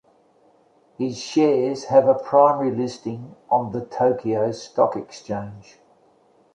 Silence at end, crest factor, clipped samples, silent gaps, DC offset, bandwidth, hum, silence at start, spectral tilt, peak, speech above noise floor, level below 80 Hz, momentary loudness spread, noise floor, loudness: 0.95 s; 20 dB; under 0.1%; none; under 0.1%; 9 kHz; none; 1 s; -6.5 dB/octave; -2 dBFS; 37 dB; -64 dBFS; 14 LU; -58 dBFS; -21 LUFS